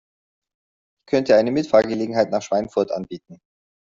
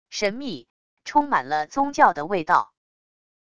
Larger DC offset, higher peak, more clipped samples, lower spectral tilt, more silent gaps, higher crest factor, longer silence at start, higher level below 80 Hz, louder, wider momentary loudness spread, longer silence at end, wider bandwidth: second, under 0.1% vs 0.5%; about the same, -2 dBFS vs -2 dBFS; neither; first, -6 dB/octave vs -4 dB/octave; second, none vs 0.70-0.97 s; about the same, 20 dB vs 22 dB; first, 1.1 s vs 0.1 s; about the same, -60 dBFS vs -60 dBFS; about the same, -20 LUFS vs -22 LUFS; second, 11 LU vs 17 LU; about the same, 0.65 s vs 0.75 s; second, 7.6 kHz vs 10 kHz